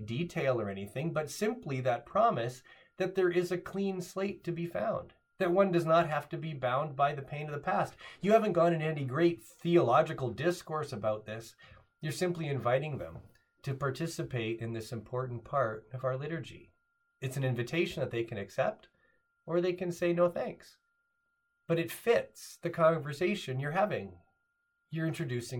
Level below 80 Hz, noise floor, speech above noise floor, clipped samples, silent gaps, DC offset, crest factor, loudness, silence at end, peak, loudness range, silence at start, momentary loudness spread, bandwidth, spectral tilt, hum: -68 dBFS; -79 dBFS; 47 dB; under 0.1%; none; under 0.1%; 20 dB; -33 LUFS; 0 s; -12 dBFS; 7 LU; 0 s; 12 LU; 18 kHz; -6.5 dB/octave; none